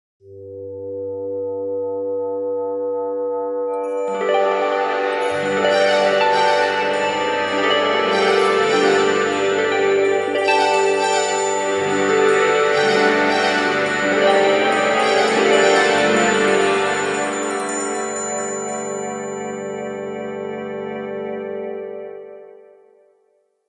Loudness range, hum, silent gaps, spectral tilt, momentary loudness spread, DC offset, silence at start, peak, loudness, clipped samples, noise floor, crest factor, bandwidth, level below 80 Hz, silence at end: 11 LU; none; none; -3 dB/octave; 12 LU; under 0.1%; 0.25 s; -2 dBFS; -18 LUFS; under 0.1%; -63 dBFS; 16 dB; 11.5 kHz; -62 dBFS; 1.15 s